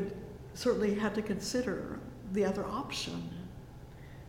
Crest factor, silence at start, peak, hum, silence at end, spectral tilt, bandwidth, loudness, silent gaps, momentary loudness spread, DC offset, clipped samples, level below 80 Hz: 18 dB; 0 s; -18 dBFS; none; 0 s; -5 dB/octave; 16.5 kHz; -35 LUFS; none; 18 LU; under 0.1%; under 0.1%; -54 dBFS